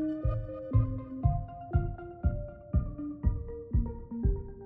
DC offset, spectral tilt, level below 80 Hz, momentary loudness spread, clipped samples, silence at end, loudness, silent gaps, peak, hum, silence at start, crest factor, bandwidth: under 0.1%; -13 dB/octave; -34 dBFS; 8 LU; under 0.1%; 0 s; -34 LUFS; none; -14 dBFS; none; 0 s; 18 dB; 3.2 kHz